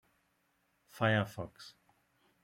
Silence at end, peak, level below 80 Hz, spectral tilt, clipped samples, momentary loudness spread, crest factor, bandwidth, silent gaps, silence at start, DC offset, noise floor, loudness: 0.75 s; -16 dBFS; -72 dBFS; -6.5 dB/octave; under 0.1%; 23 LU; 24 dB; 16 kHz; none; 0.95 s; under 0.1%; -77 dBFS; -33 LUFS